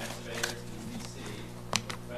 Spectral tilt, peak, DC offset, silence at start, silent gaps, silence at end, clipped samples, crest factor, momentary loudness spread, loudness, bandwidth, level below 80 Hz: -3 dB/octave; -4 dBFS; under 0.1%; 0 s; none; 0 s; under 0.1%; 34 dB; 8 LU; -37 LUFS; 15 kHz; -54 dBFS